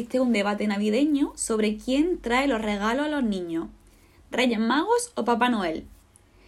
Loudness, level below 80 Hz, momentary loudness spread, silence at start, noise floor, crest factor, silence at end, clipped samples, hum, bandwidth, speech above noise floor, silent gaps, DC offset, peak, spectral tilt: -25 LUFS; -52 dBFS; 8 LU; 0 s; -56 dBFS; 16 dB; 0.6 s; under 0.1%; none; 13.5 kHz; 31 dB; none; under 0.1%; -10 dBFS; -4.5 dB/octave